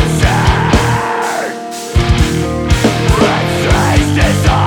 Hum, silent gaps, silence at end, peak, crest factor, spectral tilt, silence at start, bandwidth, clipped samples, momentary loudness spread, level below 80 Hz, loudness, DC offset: none; none; 0 s; 0 dBFS; 12 dB; -5.5 dB/octave; 0 s; 19.5 kHz; under 0.1%; 6 LU; -18 dBFS; -12 LUFS; under 0.1%